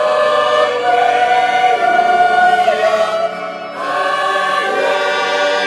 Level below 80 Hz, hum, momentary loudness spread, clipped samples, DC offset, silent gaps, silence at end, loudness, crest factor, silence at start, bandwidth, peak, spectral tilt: -64 dBFS; none; 7 LU; under 0.1%; under 0.1%; none; 0 s; -13 LUFS; 10 dB; 0 s; 12 kHz; -2 dBFS; -2 dB/octave